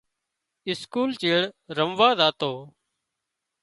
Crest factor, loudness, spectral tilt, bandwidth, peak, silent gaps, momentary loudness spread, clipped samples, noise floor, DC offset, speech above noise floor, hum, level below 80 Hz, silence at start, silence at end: 22 dB; -23 LUFS; -5 dB/octave; 11.5 kHz; -4 dBFS; none; 13 LU; under 0.1%; -83 dBFS; under 0.1%; 59 dB; none; -68 dBFS; 0.65 s; 0.95 s